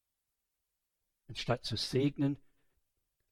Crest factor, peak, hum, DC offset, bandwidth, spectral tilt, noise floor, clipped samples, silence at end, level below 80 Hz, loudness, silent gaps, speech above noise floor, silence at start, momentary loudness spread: 22 dB; -18 dBFS; none; under 0.1%; 14 kHz; -6 dB/octave; -86 dBFS; under 0.1%; 0.95 s; -62 dBFS; -34 LUFS; none; 53 dB; 1.3 s; 12 LU